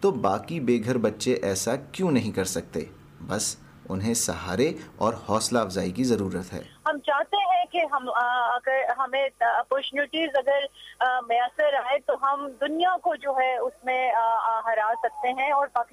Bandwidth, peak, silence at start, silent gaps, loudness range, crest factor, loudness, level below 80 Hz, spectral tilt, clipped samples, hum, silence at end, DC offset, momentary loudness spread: 15.5 kHz; -10 dBFS; 0 s; none; 3 LU; 14 dB; -26 LUFS; -60 dBFS; -4 dB/octave; under 0.1%; none; 0.1 s; under 0.1%; 6 LU